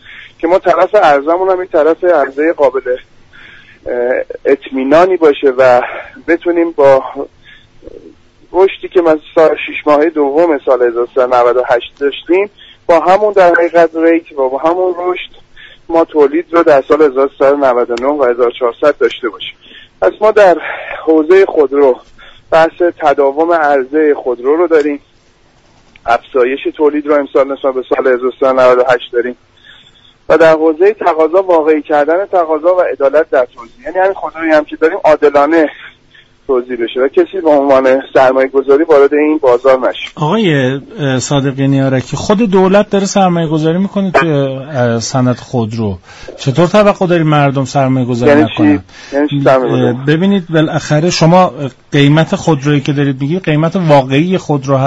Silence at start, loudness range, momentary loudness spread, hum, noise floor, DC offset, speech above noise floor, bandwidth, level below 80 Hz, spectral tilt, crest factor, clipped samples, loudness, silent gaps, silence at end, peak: 0.1 s; 3 LU; 9 LU; none; -47 dBFS; under 0.1%; 37 dB; 8 kHz; -46 dBFS; -6.5 dB/octave; 10 dB; under 0.1%; -11 LUFS; none; 0 s; 0 dBFS